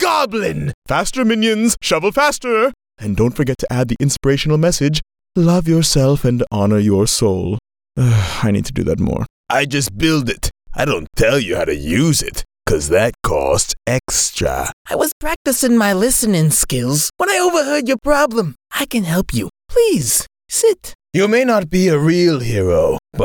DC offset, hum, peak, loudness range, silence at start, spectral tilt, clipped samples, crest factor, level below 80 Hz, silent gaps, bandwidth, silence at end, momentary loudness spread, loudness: under 0.1%; none; -4 dBFS; 3 LU; 0 s; -4.5 dB/octave; under 0.1%; 12 dB; -34 dBFS; 0.74-0.82 s, 9.30-9.44 s, 14.73-14.85 s, 15.12-15.21 s, 15.36-15.45 s, 20.95-20.99 s; over 20 kHz; 0 s; 8 LU; -16 LUFS